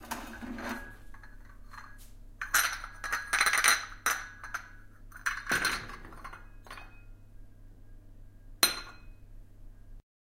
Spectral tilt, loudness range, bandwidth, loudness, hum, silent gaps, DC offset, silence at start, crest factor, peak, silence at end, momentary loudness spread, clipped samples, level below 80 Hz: 0 dB/octave; 7 LU; 16.5 kHz; -30 LUFS; none; none; under 0.1%; 0 s; 30 dB; -6 dBFS; 0.4 s; 24 LU; under 0.1%; -50 dBFS